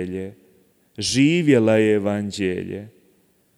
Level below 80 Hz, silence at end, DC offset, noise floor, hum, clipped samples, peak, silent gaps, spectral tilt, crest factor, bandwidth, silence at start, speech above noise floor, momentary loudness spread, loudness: -60 dBFS; 0.7 s; under 0.1%; -61 dBFS; none; under 0.1%; -4 dBFS; none; -5.5 dB/octave; 16 dB; 13 kHz; 0 s; 41 dB; 17 LU; -19 LUFS